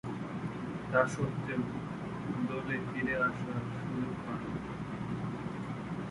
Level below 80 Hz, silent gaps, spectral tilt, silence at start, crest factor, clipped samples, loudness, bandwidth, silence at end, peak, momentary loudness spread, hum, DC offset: -58 dBFS; none; -7 dB/octave; 0.05 s; 22 dB; under 0.1%; -36 LUFS; 11.5 kHz; 0 s; -14 dBFS; 8 LU; none; under 0.1%